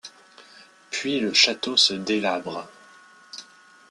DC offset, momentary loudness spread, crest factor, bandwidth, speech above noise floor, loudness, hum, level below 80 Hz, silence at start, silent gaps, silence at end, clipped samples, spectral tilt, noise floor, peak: under 0.1%; 23 LU; 22 dB; 12.5 kHz; 28 dB; -21 LUFS; none; -70 dBFS; 0.05 s; none; 0.5 s; under 0.1%; -2 dB/octave; -51 dBFS; -4 dBFS